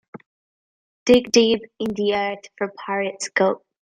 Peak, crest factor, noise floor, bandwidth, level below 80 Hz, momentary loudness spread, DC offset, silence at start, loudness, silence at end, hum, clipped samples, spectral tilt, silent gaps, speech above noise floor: -4 dBFS; 18 dB; under -90 dBFS; 14 kHz; -56 dBFS; 12 LU; under 0.1%; 1.05 s; -21 LUFS; 0.25 s; none; under 0.1%; -3.5 dB/octave; none; over 70 dB